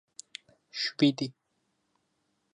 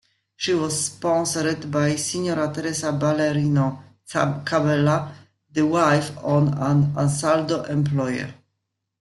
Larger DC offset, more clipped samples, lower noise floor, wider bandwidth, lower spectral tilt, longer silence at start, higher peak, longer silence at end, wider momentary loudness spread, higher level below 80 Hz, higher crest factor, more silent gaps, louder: neither; neither; about the same, -77 dBFS vs -78 dBFS; second, 11 kHz vs 12.5 kHz; about the same, -5 dB/octave vs -5.5 dB/octave; first, 0.75 s vs 0.4 s; second, -12 dBFS vs -6 dBFS; first, 1.25 s vs 0.65 s; first, 21 LU vs 7 LU; second, -80 dBFS vs -58 dBFS; about the same, 22 dB vs 18 dB; neither; second, -29 LUFS vs -22 LUFS